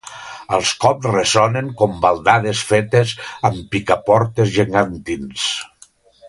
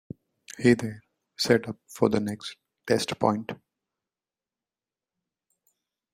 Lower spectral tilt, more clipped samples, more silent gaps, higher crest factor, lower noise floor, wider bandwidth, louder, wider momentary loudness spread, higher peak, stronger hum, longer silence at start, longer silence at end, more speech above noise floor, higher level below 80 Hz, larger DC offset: about the same, -4.5 dB/octave vs -5 dB/octave; neither; neither; second, 18 dB vs 24 dB; second, -50 dBFS vs under -90 dBFS; second, 11.5 kHz vs 16 kHz; first, -17 LUFS vs -26 LUFS; second, 9 LU vs 22 LU; first, 0 dBFS vs -6 dBFS; neither; second, 0.05 s vs 0.5 s; second, 0 s vs 2.6 s; second, 33 dB vs over 65 dB; first, -46 dBFS vs -64 dBFS; neither